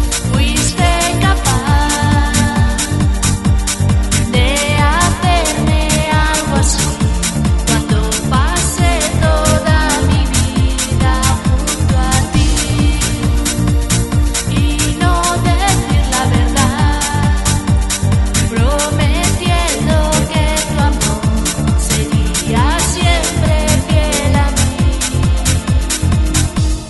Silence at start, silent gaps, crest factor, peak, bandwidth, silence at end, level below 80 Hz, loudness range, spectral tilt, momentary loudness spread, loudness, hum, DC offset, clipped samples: 0 s; none; 12 dB; 0 dBFS; 12 kHz; 0 s; -18 dBFS; 1 LU; -4.5 dB/octave; 2 LU; -13 LUFS; none; under 0.1%; under 0.1%